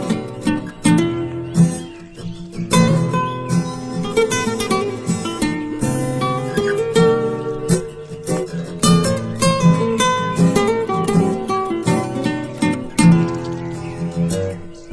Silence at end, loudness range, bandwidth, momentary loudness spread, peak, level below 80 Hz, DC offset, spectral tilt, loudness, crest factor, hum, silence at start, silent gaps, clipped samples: 0 s; 3 LU; 11 kHz; 11 LU; -2 dBFS; -42 dBFS; under 0.1%; -5.5 dB/octave; -18 LUFS; 16 dB; none; 0 s; none; under 0.1%